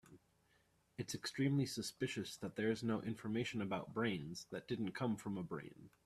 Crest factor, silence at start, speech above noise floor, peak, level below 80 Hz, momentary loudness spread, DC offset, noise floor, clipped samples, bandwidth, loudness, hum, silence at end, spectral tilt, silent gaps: 18 dB; 0.05 s; 34 dB; -24 dBFS; -74 dBFS; 10 LU; under 0.1%; -76 dBFS; under 0.1%; 14 kHz; -42 LUFS; none; 0.15 s; -5.5 dB/octave; none